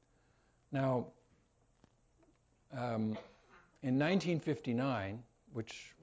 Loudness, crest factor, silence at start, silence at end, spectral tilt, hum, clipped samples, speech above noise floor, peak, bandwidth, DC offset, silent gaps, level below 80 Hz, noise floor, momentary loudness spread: -37 LUFS; 16 dB; 0.7 s; 0.1 s; -7 dB/octave; none; under 0.1%; 36 dB; -22 dBFS; 8 kHz; under 0.1%; none; -70 dBFS; -73 dBFS; 15 LU